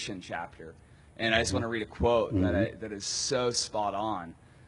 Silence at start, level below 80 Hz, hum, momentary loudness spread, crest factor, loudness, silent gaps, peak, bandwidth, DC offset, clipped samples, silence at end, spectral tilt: 0 s; -50 dBFS; none; 12 LU; 22 dB; -30 LUFS; none; -10 dBFS; 11 kHz; under 0.1%; under 0.1%; 0 s; -4 dB/octave